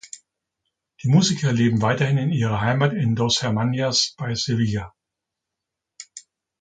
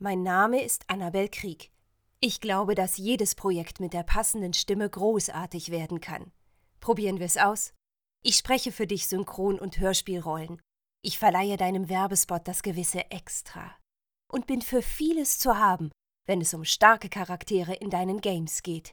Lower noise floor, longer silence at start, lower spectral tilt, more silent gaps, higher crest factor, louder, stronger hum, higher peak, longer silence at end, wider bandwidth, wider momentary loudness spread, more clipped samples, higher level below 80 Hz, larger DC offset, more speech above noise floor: first, -84 dBFS vs -72 dBFS; first, 0.15 s vs 0 s; first, -5 dB/octave vs -3 dB/octave; neither; second, 18 dB vs 24 dB; first, -21 LUFS vs -27 LUFS; neither; about the same, -4 dBFS vs -4 dBFS; first, 0.4 s vs 0 s; second, 9.4 kHz vs over 20 kHz; first, 21 LU vs 12 LU; neither; second, -52 dBFS vs -46 dBFS; neither; first, 64 dB vs 44 dB